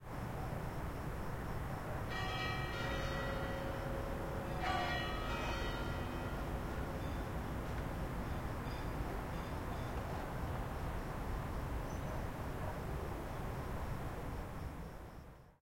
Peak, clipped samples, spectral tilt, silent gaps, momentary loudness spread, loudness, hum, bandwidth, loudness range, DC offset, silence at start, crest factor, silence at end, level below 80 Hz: -26 dBFS; under 0.1%; -6 dB/octave; none; 5 LU; -42 LUFS; none; 16.5 kHz; 4 LU; under 0.1%; 0 s; 14 dB; 0.05 s; -46 dBFS